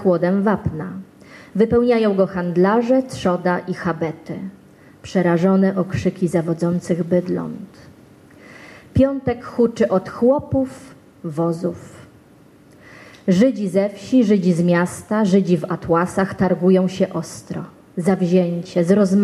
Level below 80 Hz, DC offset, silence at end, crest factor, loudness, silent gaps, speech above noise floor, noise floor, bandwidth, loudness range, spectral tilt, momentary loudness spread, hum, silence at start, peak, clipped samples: -48 dBFS; under 0.1%; 0 s; 16 dB; -19 LUFS; none; 30 dB; -48 dBFS; 12 kHz; 5 LU; -7.5 dB/octave; 13 LU; none; 0 s; -4 dBFS; under 0.1%